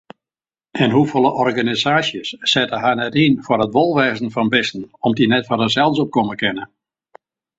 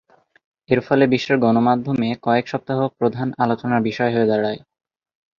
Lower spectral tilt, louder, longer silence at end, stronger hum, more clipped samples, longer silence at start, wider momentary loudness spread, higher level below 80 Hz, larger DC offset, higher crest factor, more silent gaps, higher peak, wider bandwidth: second, -5.5 dB/octave vs -7.5 dB/octave; about the same, -17 LUFS vs -19 LUFS; about the same, 0.9 s vs 0.8 s; neither; neither; about the same, 0.75 s vs 0.7 s; about the same, 6 LU vs 6 LU; about the same, -56 dBFS vs -58 dBFS; neither; about the same, 18 dB vs 18 dB; neither; about the same, 0 dBFS vs -2 dBFS; first, 8 kHz vs 7 kHz